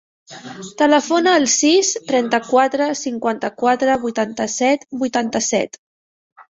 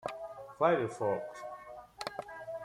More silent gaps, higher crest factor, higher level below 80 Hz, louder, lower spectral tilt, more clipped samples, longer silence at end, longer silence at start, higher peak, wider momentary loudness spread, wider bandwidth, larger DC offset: first, 5.78-6.36 s vs none; second, 16 dB vs 22 dB; first, -62 dBFS vs -72 dBFS; first, -17 LUFS vs -35 LUFS; second, -2 dB/octave vs -5.5 dB/octave; neither; first, 0.15 s vs 0 s; first, 0.3 s vs 0 s; first, -2 dBFS vs -14 dBFS; second, 8 LU vs 17 LU; second, 8 kHz vs 15 kHz; neither